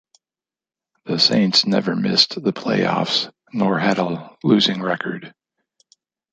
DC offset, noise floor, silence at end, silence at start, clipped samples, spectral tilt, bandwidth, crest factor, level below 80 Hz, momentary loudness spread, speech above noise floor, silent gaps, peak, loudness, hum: under 0.1%; under -90 dBFS; 1.05 s; 1.05 s; under 0.1%; -4.5 dB/octave; 9 kHz; 20 dB; -64 dBFS; 11 LU; over 71 dB; none; -2 dBFS; -18 LUFS; none